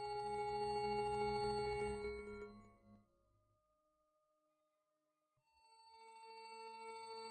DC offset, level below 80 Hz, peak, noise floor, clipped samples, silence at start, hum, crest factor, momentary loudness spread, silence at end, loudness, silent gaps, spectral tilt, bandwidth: under 0.1%; -66 dBFS; -32 dBFS; -87 dBFS; under 0.1%; 0 s; none; 16 dB; 18 LU; 0 s; -44 LUFS; none; -5 dB/octave; 8.8 kHz